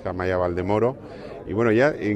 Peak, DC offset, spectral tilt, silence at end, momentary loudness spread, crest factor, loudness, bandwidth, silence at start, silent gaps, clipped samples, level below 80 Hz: -6 dBFS; under 0.1%; -8 dB/octave; 0 s; 18 LU; 16 dB; -22 LUFS; 8.6 kHz; 0 s; none; under 0.1%; -50 dBFS